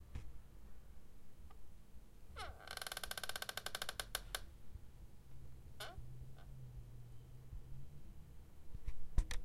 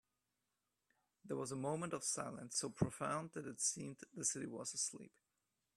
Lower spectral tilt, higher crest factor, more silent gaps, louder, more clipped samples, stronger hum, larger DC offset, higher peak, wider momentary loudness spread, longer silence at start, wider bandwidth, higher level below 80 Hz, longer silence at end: about the same, -2.5 dB/octave vs -3.5 dB/octave; about the same, 26 dB vs 24 dB; neither; second, -49 LUFS vs -42 LUFS; neither; neither; neither; about the same, -20 dBFS vs -20 dBFS; first, 19 LU vs 9 LU; second, 0 s vs 1.25 s; first, 16 kHz vs 14 kHz; first, -50 dBFS vs -74 dBFS; second, 0 s vs 0.7 s